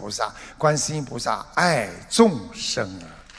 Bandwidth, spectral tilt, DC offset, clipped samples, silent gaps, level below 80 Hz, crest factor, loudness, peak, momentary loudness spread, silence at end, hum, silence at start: 11 kHz; -4 dB/octave; under 0.1%; under 0.1%; none; -52 dBFS; 22 dB; -23 LUFS; -2 dBFS; 10 LU; 0 s; none; 0 s